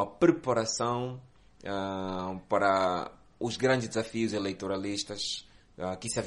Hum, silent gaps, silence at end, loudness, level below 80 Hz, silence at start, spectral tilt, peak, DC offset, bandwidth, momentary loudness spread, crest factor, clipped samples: none; none; 0 s; -31 LUFS; -62 dBFS; 0 s; -4.5 dB/octave; -10 dBFS; under 0.1%; 11.5 kHz; 12 LU; 20 dB; under 0.1%